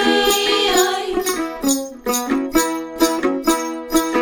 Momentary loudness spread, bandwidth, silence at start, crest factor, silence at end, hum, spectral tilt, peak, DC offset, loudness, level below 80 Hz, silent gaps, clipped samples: 7 LU; over 20 kHz; 0 s; 16 dB; 0 s; none; -1.5 dB/octave; -2 dBFS; under 0.1%; -18 LUFS; -42 dBFS; none; under 0.1%